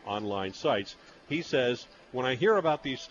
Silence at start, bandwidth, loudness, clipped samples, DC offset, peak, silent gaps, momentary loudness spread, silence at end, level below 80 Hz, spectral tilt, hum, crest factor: 0.05 s; 7.4 kHz; -30 LUFS; under 0.1%; under 0.1%; -14 dBFS; none; 11 LU; 0.05 s; -66 dBFS; -5 dB/octave; none; 16 dB